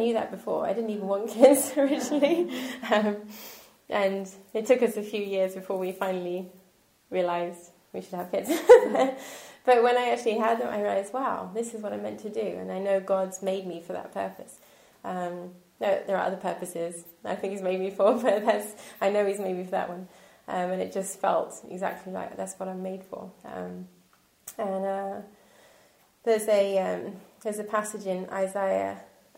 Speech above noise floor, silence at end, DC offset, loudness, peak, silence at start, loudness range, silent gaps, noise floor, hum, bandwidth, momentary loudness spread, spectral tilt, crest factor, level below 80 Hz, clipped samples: 36 dB; 0.3 s; under 0.1%; -27 LUFS; -4 dBFS; 0 s; 10 LU; none; -63 dBFS; none; 16 kHz; 16 LU; -4.5 dB/octave; 24 dB; -74 dBFS; under 0.1%